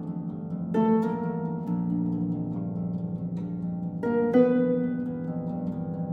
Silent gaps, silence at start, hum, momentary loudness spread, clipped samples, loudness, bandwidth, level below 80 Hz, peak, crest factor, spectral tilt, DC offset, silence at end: none; 0 s; none; 10 LU; under 0.1%; -28 LUFS; 4.1 kHz; -60 dBFS; -8 dBFS; 18 dB; -11 dB/octave; under 0.1%; 0 s